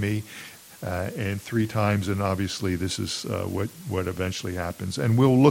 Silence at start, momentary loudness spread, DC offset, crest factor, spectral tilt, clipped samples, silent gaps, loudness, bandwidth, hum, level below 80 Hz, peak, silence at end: 0 s; 9 LU; under 0.1%; 22 dB; -6 dB/octave; under 0.1%; none; -26 LUFS; 16.5 kHz; none; -56 dBFS; -4 dBFS; 0 s